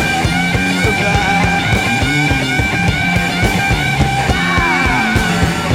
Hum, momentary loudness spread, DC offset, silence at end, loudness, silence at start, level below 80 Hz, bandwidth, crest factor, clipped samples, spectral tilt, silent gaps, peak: none; 2 LU; under 0.1%; 0 s; -13 LUFS; 0 s; -26 dBFS; 16.5 kHz; 12 dB; under 0.1%; -4.5 dB/octave; none; 0 dBFS